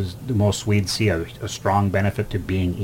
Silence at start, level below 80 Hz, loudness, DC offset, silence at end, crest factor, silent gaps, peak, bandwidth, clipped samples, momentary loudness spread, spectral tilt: 0 s; -42 dBFS; -22 LUFS; under 0.1%; 0 s; 14 dB; none; -8 dBFS; 16.5 kHz; under 0.1%; 6 LU; -5.5 dB/octave